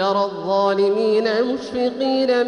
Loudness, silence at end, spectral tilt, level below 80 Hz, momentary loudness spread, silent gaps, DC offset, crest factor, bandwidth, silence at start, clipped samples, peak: -19 LUFS; 0 s; -5.5 dB/octave; -62 dBFS; 5 LU; none; under 0.1%; 12 dB; 10 kHz; 0 s; under 0.1%; -8 dBFS